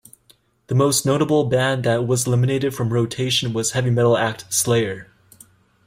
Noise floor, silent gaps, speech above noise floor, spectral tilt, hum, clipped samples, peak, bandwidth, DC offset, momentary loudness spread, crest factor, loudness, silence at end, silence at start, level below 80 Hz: -57 dBFS; none; 38 dB; -4.5 dB/octave; none; under 0.1%; -6 dBFS; 16 kHz; under 0.1%; 4 LU; 14 dB; -19 LUFS; 0.85 s; 0.7 s; -54 dBFS